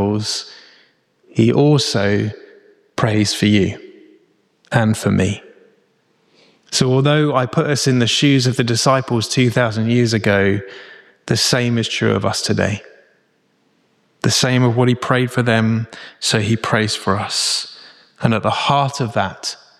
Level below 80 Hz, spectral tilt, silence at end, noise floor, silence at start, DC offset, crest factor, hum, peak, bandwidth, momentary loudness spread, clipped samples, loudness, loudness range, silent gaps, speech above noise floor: -52 dBFS; -5 dB/octave; 0.25 s; -61 dBFS; 0 s; under 0.1%; 16 dB; none; -2 dBFS; 14 kHz; 9 LU; under 0.1%; -17 LUFS; 4 LU; none; 45 dB